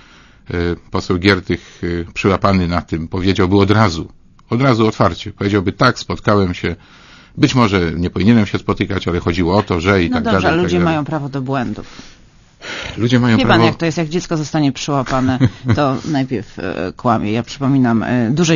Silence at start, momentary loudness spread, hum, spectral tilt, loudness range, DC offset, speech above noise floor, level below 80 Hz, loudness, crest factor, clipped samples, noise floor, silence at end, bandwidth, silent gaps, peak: 0.5 s; 10 LU; none; -6.5 dB/octave; 2 LU; under 0.1%; 30 dB; -38 dBFS; -16 LUFS; 16 dB; under 0.1%; -45 dBFS; 0 s; 7.4 kHz; none; 0 dBFS